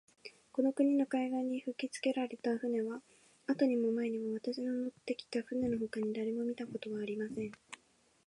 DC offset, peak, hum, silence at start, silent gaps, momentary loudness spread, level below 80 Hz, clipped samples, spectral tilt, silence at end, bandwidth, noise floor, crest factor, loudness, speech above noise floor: under 0.1%; -20 dBFS; none; 0.25 s; none; 12 LU; -74 dBFS; under 0.1%; -5.5 dB/octave; 0.55 s; 11 kHz; -70 dBFS; 16 dB; -36 LUFS; 35 dB